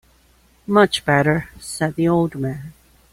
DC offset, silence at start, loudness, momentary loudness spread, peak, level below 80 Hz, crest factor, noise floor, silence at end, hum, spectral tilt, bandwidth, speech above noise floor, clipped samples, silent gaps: under 0.1%; 0.7 s; -19 LUFS; 17 LU; -2 dBFS; -50 dBFS; 18 dB; -55 dBFS; 0.4 s; none; -5.5 dB/octave; 16 kHz; 37 dB; under 0.1%; none